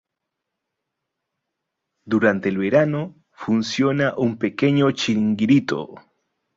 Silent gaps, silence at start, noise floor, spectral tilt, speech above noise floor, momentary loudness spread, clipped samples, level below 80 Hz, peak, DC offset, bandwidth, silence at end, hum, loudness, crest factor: none; 2.05 s; -82 dBFS; -6.5 dB/octave; 62 dB; 10 LU; under 0.1%; -60 dBFS; -4 dBFS; under 0.1%; 7.8 kHz; 0.6 s; none; -20 LUFS; 18 dB